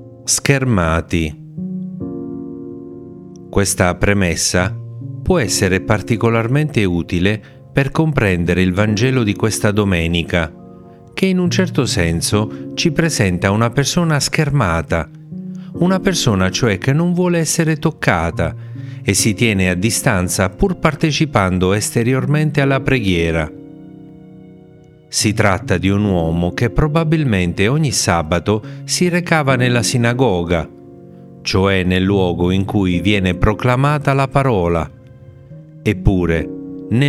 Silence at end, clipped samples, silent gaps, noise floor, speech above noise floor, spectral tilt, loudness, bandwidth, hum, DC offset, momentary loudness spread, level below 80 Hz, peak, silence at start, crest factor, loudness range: 0 s; under 0.1%; none; -43 dBFS; 28 dB; -5 dB/octave; -16 LUFS; 15.5 kHz; none; under 0.1%; 11 LU; -36 dBFS; 0 dBFS; 0 s; 16 dB; 3 LU